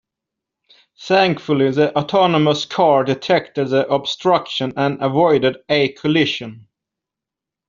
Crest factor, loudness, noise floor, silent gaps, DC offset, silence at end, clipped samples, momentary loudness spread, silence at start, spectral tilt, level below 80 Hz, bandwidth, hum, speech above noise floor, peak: 16 dB; -17 LUFS; -86 dBFS; none; under 0.1%; 1.1 s; under 0.1%; 5 LU; 1 s; -4 dB/octave; -60 dBFS; 7.6 kHz; none; 69 dB; -2 dBFS